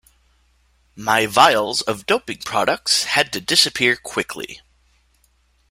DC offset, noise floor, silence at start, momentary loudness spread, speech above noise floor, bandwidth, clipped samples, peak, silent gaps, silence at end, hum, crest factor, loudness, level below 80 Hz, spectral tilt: under 0.1%; -61 dBFS; 0.95 s; 12 LU; 42 dB; 16 kHz; under 0.1%; 0 dBFS; none; 1.15 s; none; 20 dB; -18 LUFS; -56 dBFS; -1.5 dB/octave